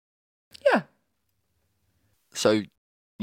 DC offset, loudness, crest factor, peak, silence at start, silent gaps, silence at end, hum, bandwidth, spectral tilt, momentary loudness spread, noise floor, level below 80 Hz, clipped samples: under 0.1%; -25 LUFS; 22 dB; -8 dBFS; 0.65 s; 2.78-3.19 s; 0 s; none; 16 kHz; -4 dB/octave; 14 LU; -76 dBFS; -72 dBFS; under 0.1%